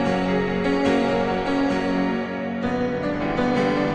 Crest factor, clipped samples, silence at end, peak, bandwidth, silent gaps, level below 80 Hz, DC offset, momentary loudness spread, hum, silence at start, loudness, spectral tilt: 14 dB; under 0.1%; 0 s; -8 dBFS; 9.2 kHz; none; -44 dBFS; under 0.1%; 5 LU; none; 0 s; -22 LUFS; -6.5 dB/octave